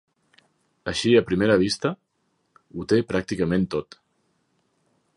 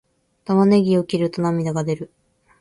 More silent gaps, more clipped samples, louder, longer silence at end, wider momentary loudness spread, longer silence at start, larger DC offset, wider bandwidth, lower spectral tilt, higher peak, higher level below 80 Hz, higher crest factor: neither; neither; second, -23 LUFS vs -19 LUFS; first, 1.35 s vs 0.55 s; about the same, 16 LU vs 15 LU; first, 0.85 s vs 0.5 s; neither; about the same, 11.5 kHz vs 11.5 kHz; second, -5.5 dB/octave vs -7.5 dB/octave; about the same, -6 dBFS vs -4 dBFS; first, -52 dBFS vs -58 dBFS; about the same, 20 dB vs 16 dB